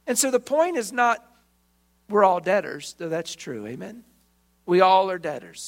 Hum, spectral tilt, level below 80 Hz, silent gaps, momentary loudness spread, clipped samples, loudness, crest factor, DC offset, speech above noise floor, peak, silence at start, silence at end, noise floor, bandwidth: none; -3.5 dB/octave; -68 dBFS; none; 16 LU; under 0.1%; -22 LUFS; 22 dB; under 0.1%; 42 dB; -2 dBFS; 0.05 s; 0 s; -65 dBFS; 16 kHz